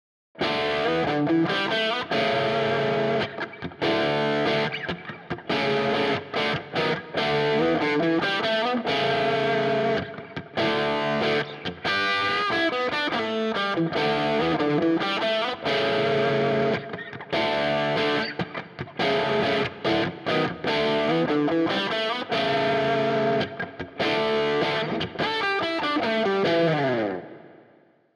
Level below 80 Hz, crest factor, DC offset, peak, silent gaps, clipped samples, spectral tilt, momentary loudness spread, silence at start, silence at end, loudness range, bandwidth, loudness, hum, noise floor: -60 dBFS; 12 dB; under 0.1%; -12 dBFS; none; under 0.1%; -5.5 dB/octave; 7 LU; 0.4 s; 0.65 s; 2 LU; 11 kHz; -24 LUFS; none; -58 dBFS